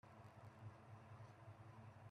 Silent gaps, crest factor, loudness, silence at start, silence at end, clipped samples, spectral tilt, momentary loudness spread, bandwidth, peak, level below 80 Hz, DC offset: none; 14 dB; -62 LUFS; 0.05 s; 0 s; under 0.1%; -7 dB/octave; 2 LU; 11.5 kHz; -46 dBFS; -82 dBFS; under 0.1%